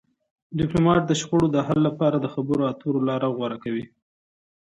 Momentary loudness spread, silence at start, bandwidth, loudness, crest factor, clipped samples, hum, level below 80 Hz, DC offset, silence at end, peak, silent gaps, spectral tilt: 10 LU; 0.5 s; 8.8 kHz; -23 LUFS; 16 dB; under 0.1%; none; -52 dBFS; under 0.1%; 0.85 s; -6 dBFS; none; -6.5 dB/octave